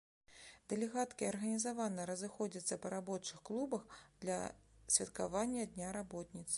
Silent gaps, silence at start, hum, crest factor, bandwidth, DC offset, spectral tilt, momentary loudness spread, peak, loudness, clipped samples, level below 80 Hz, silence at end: none; 0.3 s; none; 24 dB; 11.5 kHz; under 0.1%; -3.5 dB/octave; 13 LU; -18 dBFS; -41 LUFS; under 0.1%; -70 dBFS; 0 s